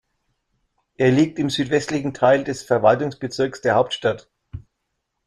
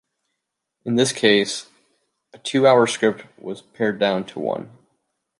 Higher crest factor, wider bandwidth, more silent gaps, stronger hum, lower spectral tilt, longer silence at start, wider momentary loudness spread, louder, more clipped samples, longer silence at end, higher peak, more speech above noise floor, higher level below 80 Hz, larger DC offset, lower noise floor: about the same, 20 dB vs 20 dB; about the same, 12.5 kHz vs 11.5 kHz; neither; neither; first, -5.5 dB/octave vs -4 dB/octave; first, 1 s vs 0.85 s; about the same, 17 LU vs 19 LU; about the same, -20 LUFS vs -20 LUFS; neither; about the same, 0.65 s vs 0.75 s; about the same, -2 dBFS vs -2 dBFS; about the same, 57 dB vs 60 dB; first, -54 dBFS vs -68 dBFS; neither; second, -76 dBFS vs -80 dBFS